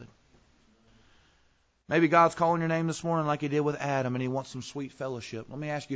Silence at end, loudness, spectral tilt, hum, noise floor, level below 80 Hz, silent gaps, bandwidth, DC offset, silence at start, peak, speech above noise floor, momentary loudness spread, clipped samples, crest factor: 0 s; -28 LUFS; -6.5 dB/octave; none; -68 dBFS; -66 dBFS; none; 8 kHz; under 0.1%; 0 s; -8 dBFS; 40 dB; 15 LU; under 0.1%; 22 dB